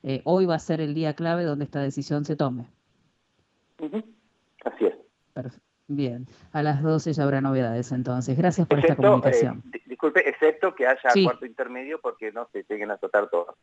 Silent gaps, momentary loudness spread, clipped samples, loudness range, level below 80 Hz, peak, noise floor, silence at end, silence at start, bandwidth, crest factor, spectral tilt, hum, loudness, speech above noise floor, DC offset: none; 16 LU; under 0.1%; 11 LU; -66 dBFS; -6 dBFS; -70 dBFS; 0.1 s; 0.05 s; 8.2 kHz; 18 dB; -7 dB/octave; none; -24 LUFS; 46 dB; under 0.1%